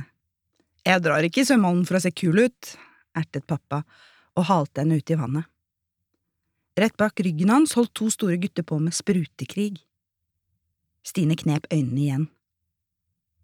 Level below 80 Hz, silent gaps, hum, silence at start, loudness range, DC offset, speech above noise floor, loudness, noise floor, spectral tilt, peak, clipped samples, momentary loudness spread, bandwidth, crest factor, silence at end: -66 dBFS; none; none; 0 s; 5 LU; under 0.1%; 59 dB; -23 LUFS; -82 dBFS; -5.5 dB/octave; -4 dBFS; under 0.1%; 12 LU; 16.5 kHz; 22 dB; 1.15 s